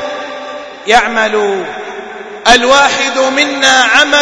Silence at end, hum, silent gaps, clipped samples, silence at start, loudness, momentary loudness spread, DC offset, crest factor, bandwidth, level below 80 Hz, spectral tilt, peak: 0 s; none; none; 1%; 0 s; -9 LUFS; 18 LU; under 0.1%; 12 dB; 11 kHz; -40 dBFS; -1 dB/octave; 0 dBFS